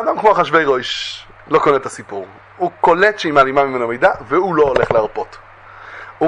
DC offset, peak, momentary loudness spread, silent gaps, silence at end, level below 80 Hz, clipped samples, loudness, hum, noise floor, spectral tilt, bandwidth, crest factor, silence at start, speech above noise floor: under 0.1%; 0 dBFS; 18 LU; none; 0 s; -48 dBFS; under 0.1%; -15 LUFS; none; -38 dBFS; -5 dB/octave; 10.5 kHz; 16 dB; 0 s; 22 dB